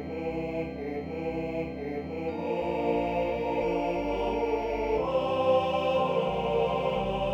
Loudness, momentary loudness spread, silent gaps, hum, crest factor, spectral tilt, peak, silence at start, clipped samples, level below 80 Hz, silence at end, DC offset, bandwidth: -29 LUFS; 8 LU; none; none; 14 dB; -7 dB/octave; -14 dBFS; 0 s; under 0.1%; -48 dBFS; 0 s; under 0.1%; 8.4 kHz